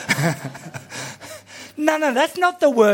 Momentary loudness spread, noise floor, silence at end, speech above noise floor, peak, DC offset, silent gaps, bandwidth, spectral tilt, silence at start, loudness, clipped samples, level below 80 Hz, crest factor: 19 LU; -39 dBFS; 0 s; 21 dB; -2 dBFS; under 0.1%; none; 17 kHz; -4.5 dB/octave; 0 s; -20 LUFS; under 0.1%; -66 dBFS; 20 dB